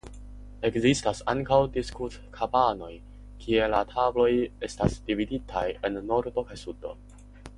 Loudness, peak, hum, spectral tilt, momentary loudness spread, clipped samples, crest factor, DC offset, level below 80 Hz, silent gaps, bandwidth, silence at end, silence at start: -27 LUFS; -8 dBFS; 50 Hz at -45 dBFS; -5.5 dB/octave; 17 LU; under 0.1%; 20 dB; under 0.1%; -44 dBFS; none; 11.5 kHz; 0 s; 0.05 s